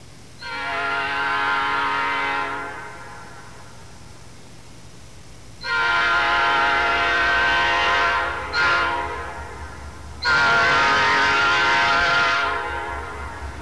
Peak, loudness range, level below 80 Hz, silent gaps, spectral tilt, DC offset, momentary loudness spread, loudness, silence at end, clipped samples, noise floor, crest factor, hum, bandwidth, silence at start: -10 dBFS; 11 LU; -42 dBFS; none; -2.5 dB/octave; 0.8%; 18 LU; -19 LUFS; 0 s; under 0.1%; -44 dBFS; 12 dB; none; 11 kHz; 0 s